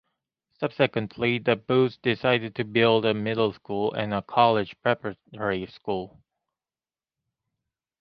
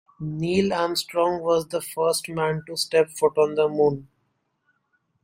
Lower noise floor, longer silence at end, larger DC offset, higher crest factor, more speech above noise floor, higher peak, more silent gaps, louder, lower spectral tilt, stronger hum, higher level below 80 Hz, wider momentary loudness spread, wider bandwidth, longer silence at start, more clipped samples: first, under -90 dBFS vs -72 dBFS; first, 1.95 s vs 1.2 s; neither; about the same, 22 dB vs 18 dB; first, over 65 dB vs 49 dB; about the same, -4 dBFS vs -6 dBFS; neither; about the same, -25 LUFS vs -23 LUFS; first, -8.5 dB/octave vs -4.5 dB/octave; neither; about the same, -62 dBFS vs -60 dBFS; first, 11 LU vs 6 LU; second, 5.8 kHz vs 16.5 kHz; first, 0.6 s vs 0.2 s; neither